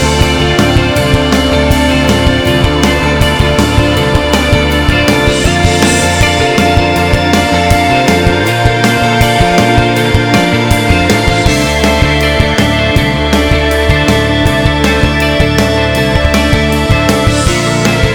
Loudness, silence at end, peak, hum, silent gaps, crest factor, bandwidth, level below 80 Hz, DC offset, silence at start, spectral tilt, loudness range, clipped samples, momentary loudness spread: -9 LUFS; 0 s; 0 dBFS; none; none; 8 dB; over 20 kHz; -18 dBFS; under 0.1%; 0 s; -5 dB/octave; 1 LU; 0.5%; 1 LU